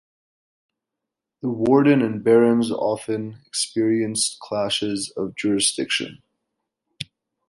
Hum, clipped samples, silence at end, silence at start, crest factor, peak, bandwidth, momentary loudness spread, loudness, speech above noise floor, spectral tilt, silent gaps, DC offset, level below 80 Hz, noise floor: none; under 0.1%; 0.45 s; 1.45 s; 18 dB; -4 dBFS; 11.5 kHz; 14 LU; -21 LUFS; 64 dB; -4 dB/octave; none; under 0.1%; -62 dBFS; -84 dBFS